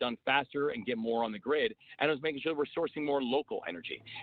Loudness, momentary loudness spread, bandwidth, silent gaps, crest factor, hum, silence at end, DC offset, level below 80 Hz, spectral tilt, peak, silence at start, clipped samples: -33 LUFS; 8 LU; 4.7 kHz; none; 20 dB; none; 0 s; under 0.1%; -72 dBFS; -7.5 dB/octave; -14 dBFS; 0 s; under 0.1%